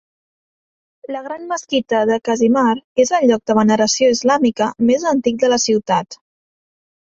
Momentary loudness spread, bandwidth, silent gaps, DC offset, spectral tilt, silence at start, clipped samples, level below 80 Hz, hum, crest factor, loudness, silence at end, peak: 11 LU; 7.8 kHz; 2.84-2.95 s; under 0.1%; -4 dB/octave; 1.1 s; under 0.1%; -58 dBFS; none; 16 dB; -16 LUFS; 0.9 s; -2 dBFS